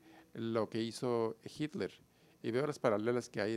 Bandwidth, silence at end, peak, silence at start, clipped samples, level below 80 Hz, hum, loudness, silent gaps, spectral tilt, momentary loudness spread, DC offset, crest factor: 14.5 kHz; 0 s; -16 dBFS; 0.05 s; under 0.1%; -78 dBFS; none; -37 LUFS; none; -6 dB/octave; 10 LU; under 0.1%; 22 dB